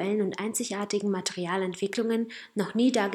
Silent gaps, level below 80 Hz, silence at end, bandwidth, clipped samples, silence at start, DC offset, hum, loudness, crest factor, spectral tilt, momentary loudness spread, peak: none; -78 dBFS; 0 s; 17 kHz; under 0.1%; 0 s; under 0.1%; none; -29 LUFS; 16 dB; -4.5 dB/octave; 6 LU; -12 dBFS